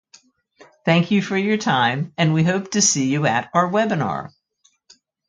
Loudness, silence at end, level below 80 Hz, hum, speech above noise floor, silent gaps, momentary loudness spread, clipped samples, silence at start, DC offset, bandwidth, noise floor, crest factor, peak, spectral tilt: -19 LUFS; 1 s; -60 dBFS; none; 44 dB; none; 7 LU; under 0.1%; 0.85 s; under 0.1%; 9.6 kHz; -63 dBFS; 18 dB; -2 dBFS; -4 dB/octave